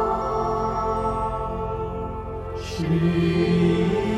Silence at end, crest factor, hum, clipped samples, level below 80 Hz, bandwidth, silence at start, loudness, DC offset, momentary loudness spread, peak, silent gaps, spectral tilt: 0 s; 14 dB; none; under 0.1%; -36 dBFS; 9.8 kHz; 0 s; -24 LUFS; under 0.1%; 11 LU; -10 dBFS; none; -7.5 dB/octave